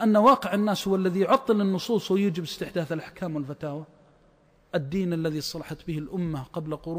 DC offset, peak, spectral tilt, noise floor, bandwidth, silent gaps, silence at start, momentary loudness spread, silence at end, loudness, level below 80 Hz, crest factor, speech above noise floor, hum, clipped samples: under 0.1%; -8 dBFS; -6.5 dB/octave; -60 dBFS; 15.5 kHz; none; 0 s; 12 LU; 0 s; -26 LUFS; -58 dBFS; 18 dB; 35 dB; none; under 0.1%